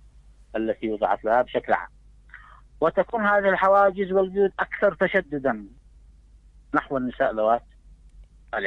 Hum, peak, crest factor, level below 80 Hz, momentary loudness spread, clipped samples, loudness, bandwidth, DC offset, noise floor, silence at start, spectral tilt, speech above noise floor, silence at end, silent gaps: none; -6 dBFS; 20 dB; -52 dBFS; 9 LU; under 0.1%; -23 LUFS; 5.4 kHz; under 0.1%; -52 dBFS; 0.55 s; -7.5 dB/octave; 29 dB; 0 s; none